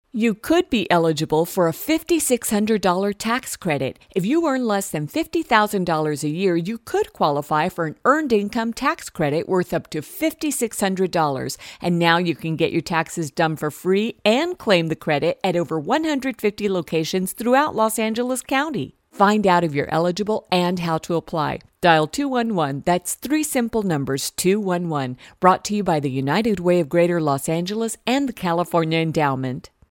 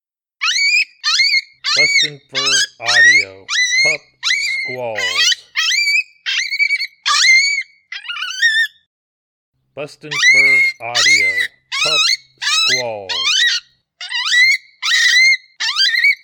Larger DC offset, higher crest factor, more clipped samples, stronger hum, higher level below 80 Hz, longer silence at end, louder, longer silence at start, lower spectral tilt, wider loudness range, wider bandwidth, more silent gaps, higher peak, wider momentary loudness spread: neither; first, 20 dB vs 14 dB; neither; neither; first, -54 dBFS vs -72 dBFS; first, 0.3 s vs 0.1 s; second, -21 LUFS vs -13 LUFS; second, 0.15 s vs 0.4 s; first, -5 dB/octave vs 1.5 dB/octave; about the same, 2 LU vs 3 LU; second, 17 kHz vs 19 kHz; second, none vs 8.87-9.52 s; about the same, 0 dBFS vs -2 dBFS; second, 7 LU vs 12 LU